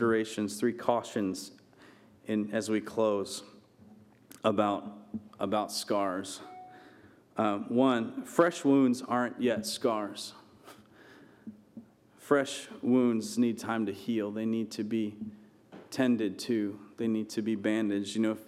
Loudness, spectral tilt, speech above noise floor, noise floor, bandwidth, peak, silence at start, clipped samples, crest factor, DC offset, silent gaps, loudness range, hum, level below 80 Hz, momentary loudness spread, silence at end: -31 LUFS; -5 dB/octave; 27 dB; -57 dBFS; 15 kHz; -8 dBFS; 0 s; under 0.1%; 22 dB; under 0.1%; none; 5 LU; none; -78 dBFS; 16 LU; 0.05 s